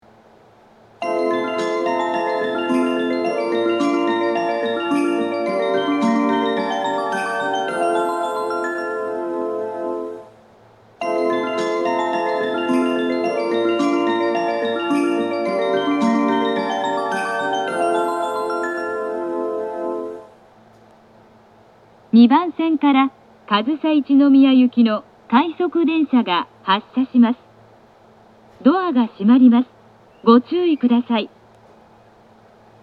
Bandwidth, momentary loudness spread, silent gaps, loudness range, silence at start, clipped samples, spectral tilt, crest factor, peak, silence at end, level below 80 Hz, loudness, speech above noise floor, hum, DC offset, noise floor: 11.5 kHz; 10 LU; none; 7 LU; 1 s; under 0.1%; -5.5 dB/octave; 18 dB; -2 dBFS; 1.55 s; -70 dBFS; -19 LUFS; 34 dB; none; under 0.1%; -49 dBFS